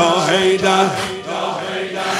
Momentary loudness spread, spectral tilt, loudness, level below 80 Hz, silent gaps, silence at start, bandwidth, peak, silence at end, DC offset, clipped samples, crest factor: 9 LU; -3.5 dB/octave; -17 LUFS; -56 dBFS; none; 0 s; 15.5 kHz; 0 dBFS; 0 s; under 0.1%; under 0.1%; 16 dB